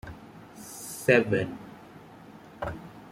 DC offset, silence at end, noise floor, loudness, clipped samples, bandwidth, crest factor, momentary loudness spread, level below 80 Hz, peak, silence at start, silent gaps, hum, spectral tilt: under 0.1%; 0 s; -49 dBFS; -27 LUFS; under 0.1%; 16.5 kHz; 24 dB; 26 LU; -56 dBFS; -8 dBFS; 0.05 s; none; none; -5.5 dB/octave